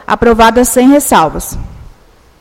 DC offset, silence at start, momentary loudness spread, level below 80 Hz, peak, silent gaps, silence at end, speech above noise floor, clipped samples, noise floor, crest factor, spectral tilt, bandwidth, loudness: under 0.1%; 0.1 s; 15 LU; -28 dBFS; 0 dBFS; none; 0.6 s; 33 dB; 1%; -41 dBFS; 10 dB; -4 dB/octave; 17 kHz; -8 LUFS